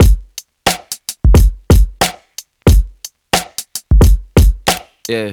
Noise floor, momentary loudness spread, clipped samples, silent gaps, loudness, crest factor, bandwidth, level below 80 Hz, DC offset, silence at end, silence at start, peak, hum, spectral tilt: -36 dBFS; 13 LU; under 0.1%; none; -14 LUFS; 12 dB; 19.5 kHz; -14 dBFS; under 0.1%; 0 s; 0 s; 0 dBFS; none; -5 dB/octave